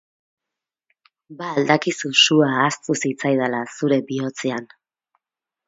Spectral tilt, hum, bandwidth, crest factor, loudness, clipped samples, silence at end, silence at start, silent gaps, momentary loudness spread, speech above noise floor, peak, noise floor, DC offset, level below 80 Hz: -4 dB/octave; none; 7.8 kHz; 22 dB; -19 LUFS; under 0.1%; 1 s; 1.3 s; none; 12 LU; 67 dB; 0 dBFS; -87 dBFS; under 0.1%; -70 dBFS